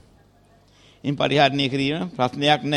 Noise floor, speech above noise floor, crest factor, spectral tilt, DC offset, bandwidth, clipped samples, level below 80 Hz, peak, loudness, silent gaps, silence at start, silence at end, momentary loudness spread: -55 dBFS; 35 dB; 18 dB; -5.5 dB/octave; under 0.1%; 10.5 kHz; under 0.1%; -56 dBFS; -4 dBFS; -21 LUFS; none; 1.05 s; 0 s; 9 LU